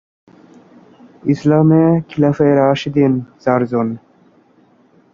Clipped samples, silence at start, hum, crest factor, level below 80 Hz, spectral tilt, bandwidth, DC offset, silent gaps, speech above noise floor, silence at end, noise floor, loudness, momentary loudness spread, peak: under 0.1%; 1.25 s; none; 14 dB; -52 dBFS; -8.5 dB/octave; 7.2 kHz; under 0.1%; none; 38 dB; 1.15 s; -52 dBFS; -15 LUFS; 9 LU; -2 dBFS